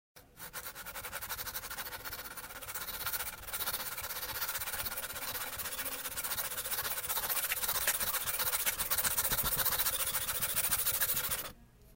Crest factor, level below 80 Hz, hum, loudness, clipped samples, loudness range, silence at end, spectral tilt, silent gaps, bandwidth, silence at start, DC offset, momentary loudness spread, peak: 22 dB; -56 dBFS; none; -33 LUFS; under 0.1%; 8 LU; 0 s; 0 dB/octave; none; 17 kHz; 0.15 s; under 0.1%; 12 LU; -14 dBFS